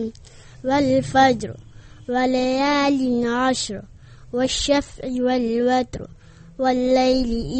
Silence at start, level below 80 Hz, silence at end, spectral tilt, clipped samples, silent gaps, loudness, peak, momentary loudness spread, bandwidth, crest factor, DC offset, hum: 0 s; -42 dBFS; 0 s; -4.5 dB/octave; under 0.1%; none; -20 LUFS; -2 dBFS; 14 LU; 8.8 kHz; 18 dB; under 0.1%; none